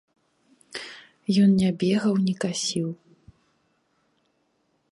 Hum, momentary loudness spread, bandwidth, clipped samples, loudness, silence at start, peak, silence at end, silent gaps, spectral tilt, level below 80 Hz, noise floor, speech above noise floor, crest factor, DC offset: none; 19 LU; 11.5 kHz; under 0.1%; -23 LUFS; 0.75 s; -10 dBFS; 1.95 s; none; -5.5 dB/octave; -64 dBFS; -70 dBFS; 48 dB; 16 dB; under 0.1%